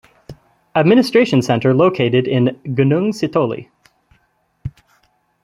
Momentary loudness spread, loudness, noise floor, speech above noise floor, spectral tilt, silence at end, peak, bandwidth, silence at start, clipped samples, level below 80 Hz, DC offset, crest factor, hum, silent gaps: 19 LU; -15 LUFS; -62 dBFS; 47 dB; -7 dB/octave; 0.75 s; -2 dBFS; 13 kHz; 0.3 s; under 0.1%; -52 dBFS; under 0.1%; 16 dB; none; none